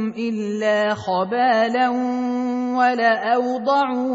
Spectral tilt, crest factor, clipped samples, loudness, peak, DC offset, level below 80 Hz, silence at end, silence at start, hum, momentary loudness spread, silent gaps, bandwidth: -5.5 dB/octave; 16 dB; under 0.1%; -20 LUFS; -4 dBFS; under 0.1%; -64 dBFS; 0 s; 0 s; none; 5 LU; none; 7.8 kHz